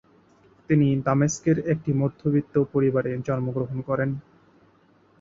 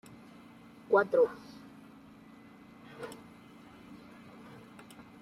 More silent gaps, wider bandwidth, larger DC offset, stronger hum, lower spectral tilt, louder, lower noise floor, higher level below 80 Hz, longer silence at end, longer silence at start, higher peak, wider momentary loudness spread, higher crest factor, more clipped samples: neither; second, 7.8 kHz vs 14.5 kHz; neither; neither; first, -7.5 dB/octave vs -6 dB/octave; first, -24 LUFS vs -30 LUFS; first, -59 dBFS vs -54 dBFS; first, -56 dBFS vs -74 dBFS; second, 1 s vs 1.25 s; second, 0.7 s vs 0.9 s; first, -8 dBFS vs -14 dBFS; second, 6 LU vs 26 LU; second, 16 dB vs 24 dB; neither